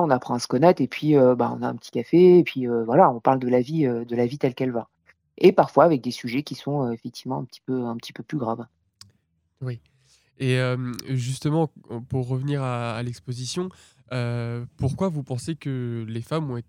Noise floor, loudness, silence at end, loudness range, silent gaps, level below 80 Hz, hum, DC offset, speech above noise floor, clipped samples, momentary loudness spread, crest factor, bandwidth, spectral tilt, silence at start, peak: -69 dBFS; -23 LUFS; 0.05 s; 11 LU; none; -58 dBFS; none; under 0.1%; 46 dB; under 0.1%; 14 LU; 20 dB; 15 kHz; -7 dB/octave; 0 s; -2 dBFS